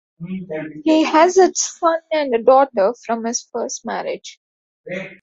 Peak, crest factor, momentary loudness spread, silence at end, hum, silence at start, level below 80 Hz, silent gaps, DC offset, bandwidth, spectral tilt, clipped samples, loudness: -2 dBFS; 16 dB; 17 LU; 0.1 s; none; 0.2 s; -66 dBFS; 4.37-4.84 s; under 0.1%; 8 kHz; -3.5 dB/octave; under 0.1%; -17 LUFS